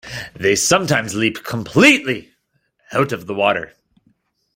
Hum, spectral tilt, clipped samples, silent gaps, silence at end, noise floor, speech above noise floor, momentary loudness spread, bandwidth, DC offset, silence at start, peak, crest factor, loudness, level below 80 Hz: none; -3.5 dB/octave; under 0.1%; none; 0.9 s; -66 dBFS; 49 dB; 14 LU; 16.5 kHz; under 0.1%; 0.05 s; 0 dBFS; 18 dB; -17 LUFS; -54 dBFS